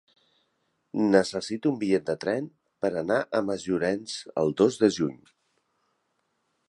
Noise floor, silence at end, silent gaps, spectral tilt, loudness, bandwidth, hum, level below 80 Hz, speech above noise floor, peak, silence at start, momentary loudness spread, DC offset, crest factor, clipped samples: -75 dBFS; 1.55 s; none; -5.5 dB/octave; -27 LUFS; 11.5 kHz; none; -64 dBFS; 49 dB; -6 dBFS; 0.95 s; 10 LU; under 0.1%; 22 dB; under 0.1%